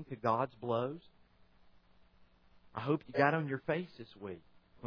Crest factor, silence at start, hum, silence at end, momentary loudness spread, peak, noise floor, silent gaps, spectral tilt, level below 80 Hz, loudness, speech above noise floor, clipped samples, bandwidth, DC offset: 24 dB; 0 s; none; 0 s; 18 LU; -14 dBFS; -65 dBFS; none; -5.5 dB/octave; -72 dBFS; -35 LUFS; 29 dB; under 0.1%; 5.4 kHz; under 0.1%